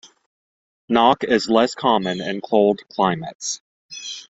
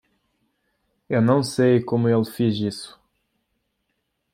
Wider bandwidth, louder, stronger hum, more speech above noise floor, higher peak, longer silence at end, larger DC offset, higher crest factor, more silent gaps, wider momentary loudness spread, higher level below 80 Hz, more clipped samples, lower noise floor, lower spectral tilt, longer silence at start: second, 8.2 kHz vs 15.5 kHz; about the same, -19 LUFS vs -21 LUFS; neither; first, over 71 dB vs 55 dB; first, -2 dBFS vs -6 dBFS; second, 0.15 s vs 1.45 s; neither; about the same, 20 dB vs 18 dB; first, 3.35-3.39 s, 3.60-3.89 s vs none; first, 15 LU vs 10 LU; about the same, -60 dBFS vs -64 dBFS; neither; first, under -90 dBFS vs -75 dBFS; second, -4 dB/octave vs -7 dB/octave; second, 0.9 s vs 1.1 s